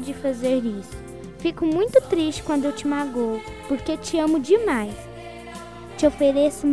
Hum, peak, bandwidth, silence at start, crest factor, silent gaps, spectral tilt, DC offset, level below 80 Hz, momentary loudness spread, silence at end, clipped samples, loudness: none; -4 dBFS; 11 kHz; 0 s; 18 dB; none; -5 dB/octave; 0.4%; -48 dBFS; 18 LU; 0 s; under 0.1%; -22 LUFS